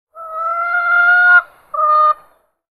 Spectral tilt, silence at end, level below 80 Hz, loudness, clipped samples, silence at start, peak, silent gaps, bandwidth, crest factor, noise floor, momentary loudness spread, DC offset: -0.5 dB/octave; 0.6 s; -66 dBFS; -12 LUFS; under 0.1%; 0.15 s; 0 dBFS; none; 11.5 kHz; 14 dB; -51 dBFS; 15 LU; under 0.1%